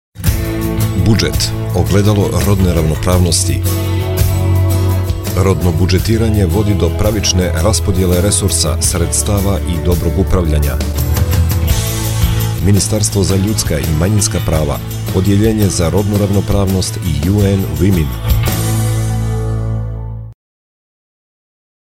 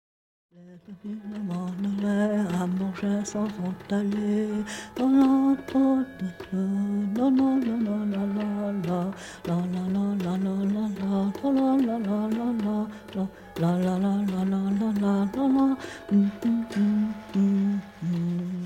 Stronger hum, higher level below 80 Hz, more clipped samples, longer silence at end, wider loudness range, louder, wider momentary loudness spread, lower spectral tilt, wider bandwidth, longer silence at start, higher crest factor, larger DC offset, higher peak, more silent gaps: neither; first, -22 dBFS vs -60 dBFS; neither; first, 1.55 s vs 0 s; about the same, 2 LU vs 3 LU; first, -14 LUFS vs -26 LUFS; second, 5 LU vs 9 LU; second, -5.5 dB/octave vs -7.5 dB/octave; first, 16.5 kHz vs 11 kHz; second, 0.15 s vs 0.6 s; about the same, 12 dB vs 14 dB; neither; first, 0 dBFS vs -10 dBFS; neither